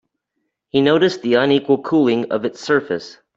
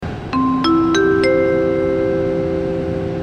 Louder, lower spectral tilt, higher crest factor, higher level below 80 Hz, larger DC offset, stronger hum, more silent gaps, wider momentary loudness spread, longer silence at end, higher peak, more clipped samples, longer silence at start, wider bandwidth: about the same, -17 LUFS vs -17 LUFS; about the same, -6 dB/octave vs -6.5 dB/octave; about the same, 16 dB vs 12 dB; second, -62 dBFS vs -40 dBFS; neither; neither; neither; about the same, 8 LU vs 7 LU; first, 0.25 s vs 0 s; about the same, -2 dBFS vs -4 dBFS; neither; first, 0.75 s vs 0 s; second, 7.8 kHz vs 8.8 kHz